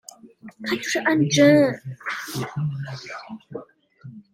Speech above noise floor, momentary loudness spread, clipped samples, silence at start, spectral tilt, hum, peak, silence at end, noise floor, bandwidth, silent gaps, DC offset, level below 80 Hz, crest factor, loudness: 23 dB; 22 LU; under 0.1%; 0.25 s; -5 dB/octave; none; -4 dBFS; 0.15 s; -45 dBFS; 16 kHz; none; under 0.1%; -64 dBFS; 20 dB; -21 LUFS